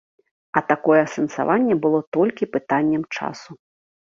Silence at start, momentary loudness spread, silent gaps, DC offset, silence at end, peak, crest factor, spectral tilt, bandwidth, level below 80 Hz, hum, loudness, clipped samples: 0.55 s; 10 LU; 2.07-2.12 s; under 0.1%; 0.55 s; -2 dBFS; 20 dB; -6.5 dB/octave; 7.4 kHz; -64 dBFS; none; -21 LUFS; under 0.1%